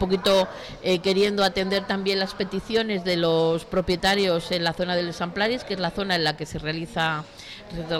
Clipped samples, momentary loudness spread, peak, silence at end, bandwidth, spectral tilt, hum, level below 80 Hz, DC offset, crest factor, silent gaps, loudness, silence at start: under 0.1%; 9 LU; -12 dBFS; 0 s; 17 kHz; -5 dB/octave; none; -48 dBFS; under 0.1%; 12 dB; none; -24 LUFS; 0 s